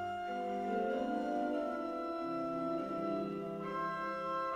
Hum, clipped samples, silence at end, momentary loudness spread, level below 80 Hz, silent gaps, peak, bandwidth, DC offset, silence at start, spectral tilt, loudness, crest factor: none; under 0.1%; 0 s; 3 LU; -70 dBFS; none; -24 dBFS; 14.5 kHz; under 0.1%; 0 s; -7 dB/octave; -38 LUFS; 14 dB